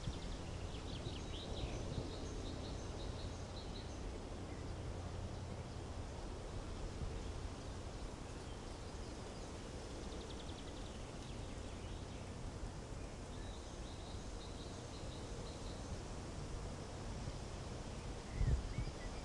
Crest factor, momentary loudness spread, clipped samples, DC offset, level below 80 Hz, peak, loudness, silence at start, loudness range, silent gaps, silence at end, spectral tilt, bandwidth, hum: 20 dB; 4 LU; under 0.1%; under 0.1%; -50 dBFS; -26 dBFS; -48 LUFS; 0 s; 3 LU; none; 0 s; -5.5 dB/octave; 11.5 kHz; none